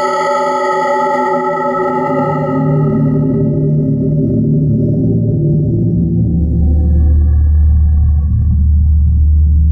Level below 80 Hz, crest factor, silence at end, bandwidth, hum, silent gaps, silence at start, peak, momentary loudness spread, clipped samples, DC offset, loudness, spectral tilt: -14 dBFS; 8 dB; 0 s; 7.2 kHz; none; none; 0 s; -2 dBFS; 3 LU; under 0.1%; under 0.1%; -13 LUFS; -9 dB/octave